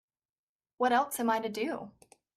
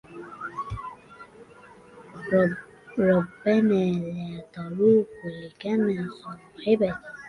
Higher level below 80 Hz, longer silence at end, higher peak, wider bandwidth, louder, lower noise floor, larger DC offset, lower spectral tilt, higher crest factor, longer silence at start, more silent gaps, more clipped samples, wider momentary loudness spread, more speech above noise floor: second, -76 dBFS vs -56 dBFS; first, 0.45 s vs 0 s; second, -16 dBFS vs -8 dBFS; first, 14 kHz vs 10.5 kHz; second, -31 LUFS vs -25 LUFS; first, under -90 dBFS vs -50 dBFS; neither; second, -3.5 dB/octave vs -8.5 dB/octave; about the same, 18 dB vs 18 dB; first, 0.8 s vs 0.1 s; neither; neither; second, 12 LU vs 19 LU; first, over 59 dB vs 26 dB